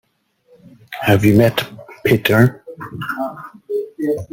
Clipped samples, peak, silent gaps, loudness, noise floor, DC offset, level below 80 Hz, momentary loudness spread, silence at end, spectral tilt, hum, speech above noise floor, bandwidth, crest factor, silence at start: under 0.1%; -2 dBFS; none; -17 LUFS; -58 dBFS; under 0.1%; -48 dBFS; 19 LU; 0.05 s; -6.5 dB/octave; none; 43 dB; 17 kHz; 16 dB; 0.9 s